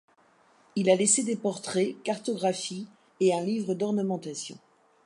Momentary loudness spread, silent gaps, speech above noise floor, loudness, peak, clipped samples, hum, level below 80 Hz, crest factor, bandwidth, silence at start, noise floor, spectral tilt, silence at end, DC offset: 14 LU; none; 35 dB; -28 LUFS; -10 dBFS; under 0.1%; none; -80 dBFS; 20 dB; 11.5 kHz; 0.75 s; -62 dBFS; -4 dB/octave; 0.5 s; under 0.1%